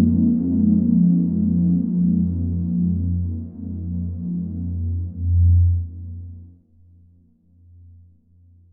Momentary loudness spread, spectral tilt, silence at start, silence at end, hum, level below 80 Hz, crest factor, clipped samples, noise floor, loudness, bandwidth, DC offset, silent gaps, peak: 14 LU; -16.5 dB/octave; 0 s; 2.2 s; none; -40 dBFS; 14 dB; under 0.1%; -55 dBFS; -20 LUFS; 1 kHz; under 0.1%; none; -6 dBFS